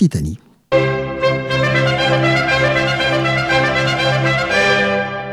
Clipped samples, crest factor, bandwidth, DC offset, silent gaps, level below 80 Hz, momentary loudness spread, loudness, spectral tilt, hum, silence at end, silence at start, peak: under 0.1%; 14 dB; 12.5 kHz; under 0.1%; none; -38 dBFS; 5 LU; -15 LUFS; -5.5 dB/octave; none; 0 s; 0 s; -2 dBFS